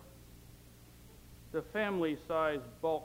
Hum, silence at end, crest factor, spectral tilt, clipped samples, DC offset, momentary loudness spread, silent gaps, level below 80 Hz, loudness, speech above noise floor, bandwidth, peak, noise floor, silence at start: none; 0 s; 18 dB; -6 dB/octave; under 0.1%; under 0.1%; 23 LU; none; -60 dBFS; -36 LUFS; 22 dB; 16.5 kHz; -20 dBFS; -57 dBFS; 0 s